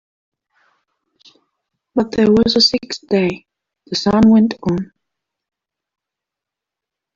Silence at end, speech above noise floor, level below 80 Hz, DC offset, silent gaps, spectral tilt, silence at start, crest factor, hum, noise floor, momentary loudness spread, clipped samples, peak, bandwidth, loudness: 2.3 s; 71 dB; -48 dBFS; under 0.1%; none; -5.5 dB/octave; 1.95 s; 16 dB; none; -85 dBFS; 13 LU; under 0.1%; -2 dBFS; 7.6 kHz; -15 LUFS